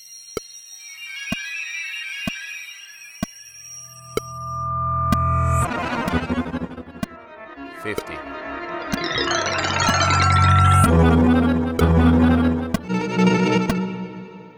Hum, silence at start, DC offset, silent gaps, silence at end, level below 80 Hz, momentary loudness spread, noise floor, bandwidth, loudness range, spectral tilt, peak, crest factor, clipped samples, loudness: none; 0 s; under 0.1%; none; 0.05 s; -34 dBFS; 21 LU; -41 dBFS; 19 kHz; 13 LU; -5.5 dB/octave; -4 dBFS; 18 dB; under 0.1%; -20 LUFS